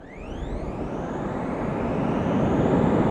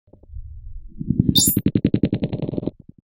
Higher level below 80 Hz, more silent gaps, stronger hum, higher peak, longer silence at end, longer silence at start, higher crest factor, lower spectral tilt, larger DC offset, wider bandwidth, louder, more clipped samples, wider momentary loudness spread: about the same, -38 dBFS vs -38 dBFS; neither; neither; second, -8 dBFS vs -2 dBFS; second, 0 s vs 0.4 s; second, 0 s vs 0.3 s; about the same, 16 dB vs 20 dB; first, -8.5 dB/octave vs -4.5 dB/octave; neither; second, 9.6 kHz vs over 20 kHz; second, -25 LUFS vs -20 LUFS; neither; second, 12 LU vs 25 LU